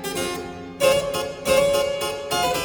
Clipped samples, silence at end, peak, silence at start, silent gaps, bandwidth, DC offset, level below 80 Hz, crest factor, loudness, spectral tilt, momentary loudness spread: under 0.1%; 0 s; -6 dBFS; 0 s; none; over 20 kHz; under 0.1%; -48 dBFS; 16 dB; -22 LUFS; -3 dB/octave; 9 LU